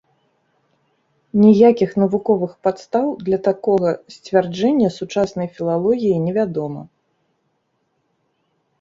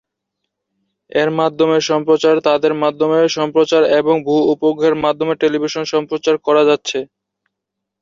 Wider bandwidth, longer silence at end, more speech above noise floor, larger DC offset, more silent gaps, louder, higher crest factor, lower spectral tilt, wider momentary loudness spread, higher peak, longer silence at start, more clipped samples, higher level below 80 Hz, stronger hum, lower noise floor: about the same, 7.6 kHz vs 7.4 kHz; first, 1.95 s vs 1 s; second, 52 dB vs 65 dB; neither; neither; second, -18 LUFS vs -15 LUFS; about the same, 18 dB vs 14 dB; first, -8 dB/octave vs -5 dB/octave; first, 10 LU vs 6 LU; about the same, -2 dBFS vs -2 dBFS; first, 1.35 s vs 1.15 s; neither; about the same, -58 dBFS vs -60 dBFS; neither; second, -69 dBFS vs -79 dBFS